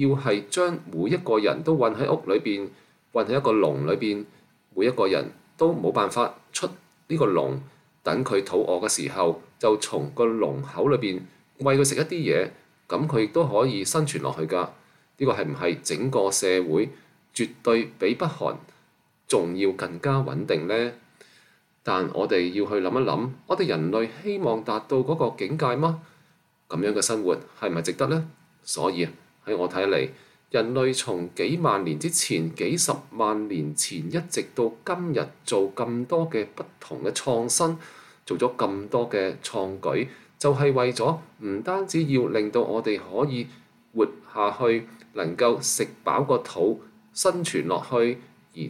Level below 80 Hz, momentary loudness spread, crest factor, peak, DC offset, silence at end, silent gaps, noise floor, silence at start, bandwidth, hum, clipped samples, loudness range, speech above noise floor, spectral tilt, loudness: -68 dBFS; 9 LU; 18 dB; -8 dBFS; under 0.1%; 0 s; none; -64 dBFS; 0 s; 15 kHz; none; under 0.1%; 3 LU; 39 dB; -4.5 dB/octave; -25 LUFS